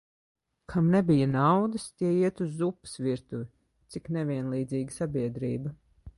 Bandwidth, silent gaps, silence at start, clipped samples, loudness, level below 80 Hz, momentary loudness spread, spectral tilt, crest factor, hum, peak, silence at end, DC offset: 11.5 kHz; none; 0.7 s; under 0.1%; -28 LUFS; -58 dBFS; 15 LU; -7.5 dB/octave; 18 dB; none; -12 dBFS; 0.05 s; under 0.1%